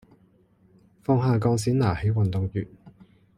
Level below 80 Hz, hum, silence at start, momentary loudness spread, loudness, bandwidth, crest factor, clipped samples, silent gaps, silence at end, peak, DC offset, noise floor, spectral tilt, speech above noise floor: -50 dBFS; none; 1.1 s; 12 LU; -25 LUFS; 14 kHz; 18 dB; under 0.1%; none; 0.45 s; -8 dBFS; under 0.1%; -60 dBFS; -7.5 dB/octave; 37 dB